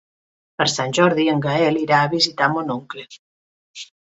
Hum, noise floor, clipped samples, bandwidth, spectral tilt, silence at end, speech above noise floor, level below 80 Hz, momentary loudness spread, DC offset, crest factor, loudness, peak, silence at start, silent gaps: none; under -90 dBFS; under 0.1%; 8.2 kHz; -4.5 dB/octave; 0.2 s; over 71 dB; -64 dBFS; 19 LU; under 0.1%; 18 dB; -18 LUFS; -2 dBFS; 0.6 s; 3.19-3.74 s